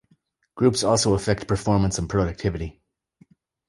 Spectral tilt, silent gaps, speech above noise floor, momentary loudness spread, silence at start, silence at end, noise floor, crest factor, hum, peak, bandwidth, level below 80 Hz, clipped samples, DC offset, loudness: -5 dB/octave; none; 43 dB; 8 LU; 0.55 s; 0.95 s; -65 dBFS; 18 dB; none; -6 dBFS; 11.5 kHz; -40 dBFS; under 0.1%; under 0.1%; -23 LUFS